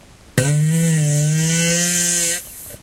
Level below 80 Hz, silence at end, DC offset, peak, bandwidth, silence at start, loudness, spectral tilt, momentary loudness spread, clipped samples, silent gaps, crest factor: -50 dBFS; 0.05 s; under 0.1%; -2 dBFS; 16 kHz; 0.35 s; -16 LUFS; -4 dB/octave; 7 LU; under 0.1%; none; 16 dB